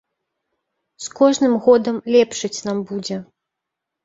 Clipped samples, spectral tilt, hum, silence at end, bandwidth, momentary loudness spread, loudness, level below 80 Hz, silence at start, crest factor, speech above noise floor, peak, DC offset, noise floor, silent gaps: under 0.1%; -4.5 dB/octave; none; 0.8 s; 8 kHz; 15 LU; -18 LUFS; -64 dBFS; 1 s; 18 dB; 64 dB; -2 dBFS; under 0.1%; -82 dBFS; none